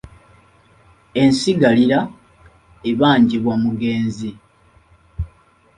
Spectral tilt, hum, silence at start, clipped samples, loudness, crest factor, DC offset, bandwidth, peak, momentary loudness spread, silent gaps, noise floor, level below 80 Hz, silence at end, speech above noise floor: -6 dB/octave; none; 0.05 s; under 0.1%; -17 LUFS; 18 dB; under 0.1%; 11 kHz; -2 dBFS; 18 LU; none; -53 dBFS; -42 dBFS; 0.5 s; 37 dB